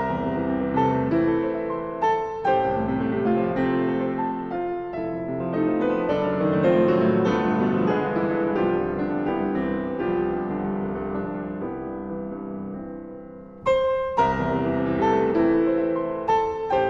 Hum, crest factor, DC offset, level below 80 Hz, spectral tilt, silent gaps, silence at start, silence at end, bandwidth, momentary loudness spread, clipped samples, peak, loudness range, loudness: none; 16 dB; under 0.1%; -48 dBFS; -8.5 dB/octave; none; 0 s; 0 s; 7.4 kHz; 11 LU; under 0.1%; -8 dBFS; 6 LU; -24 LUFS